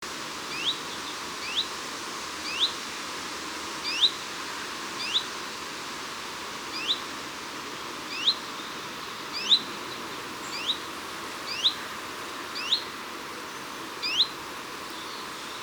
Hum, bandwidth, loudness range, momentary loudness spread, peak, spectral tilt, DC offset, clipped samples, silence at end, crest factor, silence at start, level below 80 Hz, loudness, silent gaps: none; over 20 kHz; 3 LU; 12 LU; -10 dBFS; -0.5 dB/octave; under 0.1%; under 0.1%; 0 s; 22 dB; 0 s; -66 dBFS; -29 LUFS; none